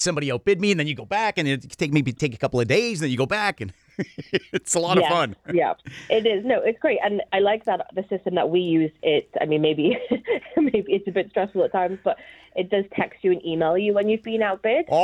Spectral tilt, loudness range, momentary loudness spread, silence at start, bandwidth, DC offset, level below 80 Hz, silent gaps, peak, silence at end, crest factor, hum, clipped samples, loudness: -5 dB/octave; 2 LU; 6 LU; 0 s; 13.5 kHz; under 0.1%; -60 dBFS; none; -6 dBFS; 0 s; 18 dB; none; under 0.1%; -23 LUFS